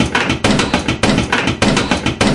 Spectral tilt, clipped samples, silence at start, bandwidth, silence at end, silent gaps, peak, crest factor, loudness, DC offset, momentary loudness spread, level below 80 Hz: -4.5 dB/octave; under 0.1%; 0 s; 11.5 kHz; 0 s; none; 0 dBFS; 14 dB; -14 LUFS; under 0.1%; 2 LU; -30 dBFS